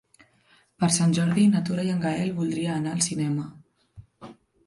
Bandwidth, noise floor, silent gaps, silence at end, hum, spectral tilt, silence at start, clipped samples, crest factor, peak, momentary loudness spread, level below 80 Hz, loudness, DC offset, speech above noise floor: 11.5 kHz; -62 dBFS; none; 0.35 s; none; -5 dB/octave; 0.8 s; under 0.1%; 20 dB; -6 dBFS; 7 LU; -62 dBFS; -24 LUFS; under 0.1%; 38 dB